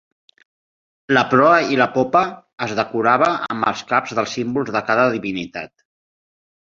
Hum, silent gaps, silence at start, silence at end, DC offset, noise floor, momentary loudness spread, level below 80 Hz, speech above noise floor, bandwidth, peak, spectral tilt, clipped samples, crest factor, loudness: none; 2.53-2.58 s; 1.1 s; 1 s; under 0.1%; under -90 dBFS; 12 LU; -60 dBFS; over 72 dB; 7.6 kHz; 0 dBFS; -5 dB/octave; under 0.1%; 18 dB; -18 LUFS